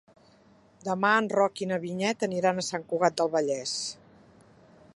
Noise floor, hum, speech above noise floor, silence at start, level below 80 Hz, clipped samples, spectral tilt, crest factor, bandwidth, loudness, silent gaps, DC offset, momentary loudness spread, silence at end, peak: -59 dBFS; none; 32 dB; 0.85 s; -72 dBFS; under 0.1%; -4 dB/octave; 20 dB; 11.5 kHz; -27 LUFS; none; under 0.1%; 10 LU; 1 s; -8 dBFS